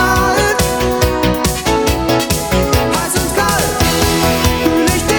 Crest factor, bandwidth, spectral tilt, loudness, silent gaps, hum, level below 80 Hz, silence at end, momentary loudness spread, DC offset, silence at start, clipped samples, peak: 14 dB; over 20 kHz; -4 dB/octave; -13 LUFS; none; none; -24 dBFS; 0 s; 2 LU; under 0.1%; 0 s; under 0.1%; 0 dBFS